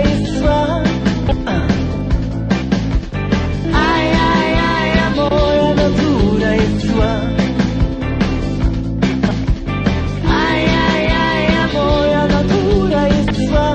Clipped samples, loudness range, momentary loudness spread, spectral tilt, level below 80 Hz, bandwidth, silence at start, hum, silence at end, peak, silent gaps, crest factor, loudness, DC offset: under 0.1%; 3 LU; 5 LU; -6.5 dB/octave; -22 dBFS; 8.8 kHz; 0 s; none; 0 s; -2 dBFS; none; 14 dB; -15 LUFS; under 0.1%